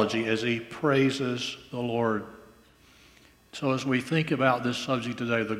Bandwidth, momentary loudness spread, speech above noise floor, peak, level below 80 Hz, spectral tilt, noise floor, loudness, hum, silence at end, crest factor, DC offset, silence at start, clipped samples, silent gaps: 15 kHz; 9 LU; 30 dB; -8 dBFS; -64 dBFS; -5.5 dB/octave; -57 dBFS; -27 LUFS; none; 0 s; 20 dB; under 0.1%; 0 s; under 0.1%; none